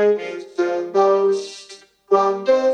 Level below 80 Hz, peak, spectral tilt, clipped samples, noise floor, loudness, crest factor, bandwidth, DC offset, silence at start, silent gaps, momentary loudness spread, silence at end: -70 dBFS; -4 dBFS; -5 dB/octave; under 0.1%; -44 dBFS; -19 LUFS; 14 dB; 9.4 kHz; under 0.1%; 0 s; none; 12 LU; 0 s